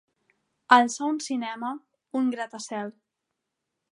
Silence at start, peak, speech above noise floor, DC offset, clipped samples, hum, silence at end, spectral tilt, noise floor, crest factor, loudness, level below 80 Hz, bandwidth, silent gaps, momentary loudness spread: 0.7 s; -2 dBFS; 58 dB; under 0.1%; under 0.1%; none; 1 s; -2.5 dB/octave; -83 dBFS; 26 dB; -26 LUFS; -86 dBFS; 11.5 kHz; none; 16 LU